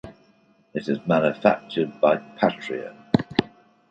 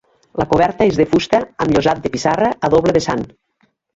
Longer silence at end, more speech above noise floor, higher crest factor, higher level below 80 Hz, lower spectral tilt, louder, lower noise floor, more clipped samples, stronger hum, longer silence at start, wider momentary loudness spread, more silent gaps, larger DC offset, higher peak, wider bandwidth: second, 0.45 s vs 0.7 s; second, 37 dB vs 47 dB; first, 22 dB vs 16 dB; second, -58 dBFS vs -42 dBFS; first, -7.5 dB/octave vs -6 dB/octave; second, -24 LUFS vs -16 LUFS; about the same, -60 dBFS vs -62 dBFS; neither; neither; second, 0.05 s vs 0.35 s; about the same, 11 LU vs 9 LU; neither; neither; about the same, -2 dBFS vs -2 dBFS; about the same, 8.6 kHz vs 8 kHz